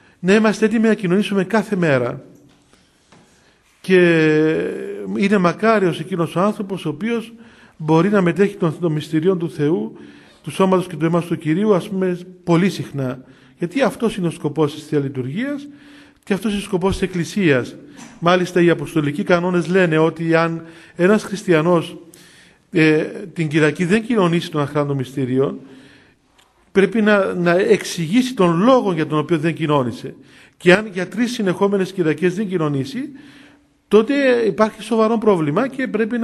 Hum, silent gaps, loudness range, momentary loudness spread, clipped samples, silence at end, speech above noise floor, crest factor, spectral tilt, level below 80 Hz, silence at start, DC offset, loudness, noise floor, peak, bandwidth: none; none; 4 LU; 10 LU; under 0.1%; 0 s; 38 dB; 18 dB; -6.5 dB/octave; -52 dBFS; 0.2 s; under 0.1%; -18 LUFS; -56 dBFS; 0 dBFS; 13 kHz